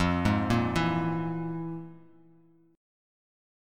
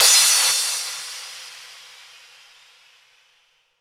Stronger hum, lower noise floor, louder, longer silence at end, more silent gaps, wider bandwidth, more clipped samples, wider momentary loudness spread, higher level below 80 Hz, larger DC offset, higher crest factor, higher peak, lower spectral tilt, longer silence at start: neither; about the same, -60 dBFS vs -63 dBFS; second, -29 LUFS vs -16 LUFS; second, 0.95 s vs 2.05 s; neither; second, 13.5 kHz vs 17 kHz; neither; second, 14 LU vs 27 LU; first, -48 dBFS vs -72 dBFS; neither; about the same, 20 dB vs 22 dB; second, -10 dBFS vs -2 dBFS; first, -7 dB/octave vs 5 dB/octave; about the same, 0 s vs 0 s